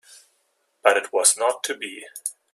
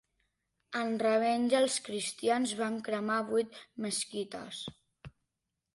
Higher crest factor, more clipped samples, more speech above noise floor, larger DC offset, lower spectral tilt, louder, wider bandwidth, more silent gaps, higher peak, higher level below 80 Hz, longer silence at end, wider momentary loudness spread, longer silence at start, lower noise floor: first, 24 dB vs 18 dB; neither; second, 47 dB vs 54 dB; neither; second, 1.5 dB/octave vs -3 dB/octave; first, -21 LUFS vs -32 LUFS; first, 15 kHz vs 11.5 kHz; neither; first, 0 dBFS vs -16 dBFS; second, -78 dBFS vs -72 dBFS; second, 0.2 s vs 0.65 s; about the same, 14 LU vs 13 LU; first, 0.85 s vs 0.7 s; second, -69 dBFS vs -86 dBFS